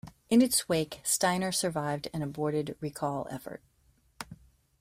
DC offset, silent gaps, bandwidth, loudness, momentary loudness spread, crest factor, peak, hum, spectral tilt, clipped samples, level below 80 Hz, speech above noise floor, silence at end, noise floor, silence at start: under 0.1%; none; 16 kHz; -29 LUFS; 20 LU; 18 dB; -12 dBFS; none; -4 dB/octave; under 0.1%; -62 dBFS; 37 dB; 0.45 s; -67 dBFS; 0.05 s